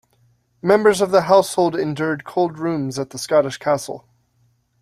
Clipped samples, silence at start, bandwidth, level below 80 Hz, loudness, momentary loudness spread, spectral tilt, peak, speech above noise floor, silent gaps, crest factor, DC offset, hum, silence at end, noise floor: under 0.1%; 0.65 s; 14.5 kHz; -60 dBFS; -19 LUFS; 11 LU; -5 dB/octave; -2 dBFS; 44 dB; none; 18 dB; under 0.1%; none; 0.85 s; -62 dBFS